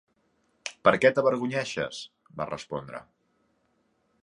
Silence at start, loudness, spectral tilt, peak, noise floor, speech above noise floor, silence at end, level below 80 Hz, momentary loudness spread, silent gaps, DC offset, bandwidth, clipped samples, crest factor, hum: 0.65 s; -26 LUFS; -5 dB/octave; -4 dBFS; -71 dBFS; 45 dB; 1.2 s; -66 dBFS; 20 LU; none; under 0.1%; 11 kHz; under 0.1%; 26 dB; none